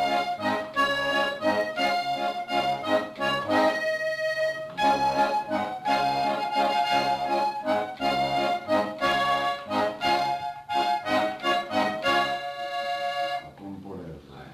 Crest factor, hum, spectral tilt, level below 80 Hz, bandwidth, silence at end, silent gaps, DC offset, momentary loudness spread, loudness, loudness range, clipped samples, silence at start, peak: 14 dB; none; -4 dB/octave; -60 dBFS; 14 kHz; 0 s; none; under 0.1%; 6 LU; -26 LUFS; 2 LU; under 0.1%; 0 s; -12 dBFS